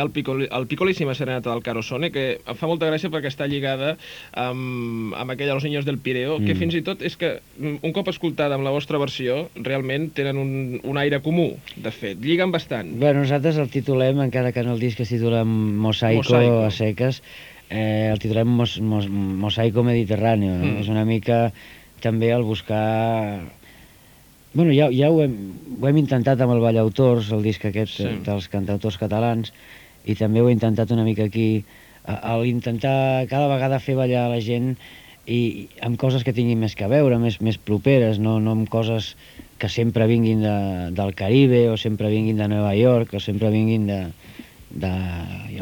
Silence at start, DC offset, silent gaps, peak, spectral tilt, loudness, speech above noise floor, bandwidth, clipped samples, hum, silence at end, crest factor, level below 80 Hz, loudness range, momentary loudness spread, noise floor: 0 s; under 0.1%; none; -2 dBFS; -7.5 dB/octave; -21 LUFS; 29 dB; over 20 kHz; under 0.1%; none; 0 s; 18 dB; -52 dBFS; 5 LU; 10 LU; -50 dBFS